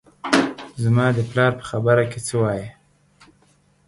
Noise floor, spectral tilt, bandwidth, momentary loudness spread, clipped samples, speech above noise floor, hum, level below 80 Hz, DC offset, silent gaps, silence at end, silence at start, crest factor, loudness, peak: -59 dBFS; -6 dB/octave; 11.5 kHz; 8 LU; under 0.1%; 39 dB; none; -54 dBFS; under 0.1%; none; 1.15 s; 0.25 s; 20 dB; -20 LUFS; -2 dBFS